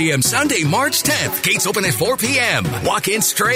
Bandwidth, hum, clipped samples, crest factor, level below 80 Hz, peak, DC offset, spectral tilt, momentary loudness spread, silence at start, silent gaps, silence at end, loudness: 16.5 kHz; none; under 0.1%; 14 dB; -48 dBFS; -4 dBFS; under 0.1%; -3 dB/octave; 2 LU; 0 s; none; 0 s; -16 LUFS